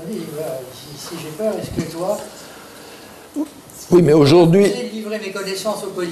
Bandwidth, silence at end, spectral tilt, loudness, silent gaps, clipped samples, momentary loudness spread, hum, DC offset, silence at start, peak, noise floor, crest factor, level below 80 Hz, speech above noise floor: 13.5 kHz; 0 s; -6 dB/octave; -18 LUFS; none; under 0.1%; 26 LU; none; under 0.1%; 0 s; 0 dBFS; -39 dBFS; 18 dB; -50 dBFS; 22 dB